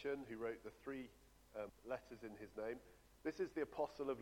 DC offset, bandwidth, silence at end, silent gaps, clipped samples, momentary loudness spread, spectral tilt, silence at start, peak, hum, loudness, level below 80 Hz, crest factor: under 0.1%; 18 kHz; 0 s; none; under 0.1%; 11 LU; -6 dB/octave; 0 s; -30 dBFS; none; -49 LUFS; -72 dBFS; 18 dB